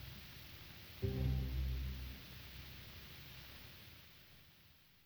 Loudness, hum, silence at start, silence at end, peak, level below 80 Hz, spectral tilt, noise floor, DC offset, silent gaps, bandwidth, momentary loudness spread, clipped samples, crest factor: -46 LUFS; none; 0 s; 0 s; -28 dBFS; -48 dBFS; -6 dB/octave; -66 dBFS; under 0.1%; none; over 20 kHz; 20 LU; under 0.1%; 18 dB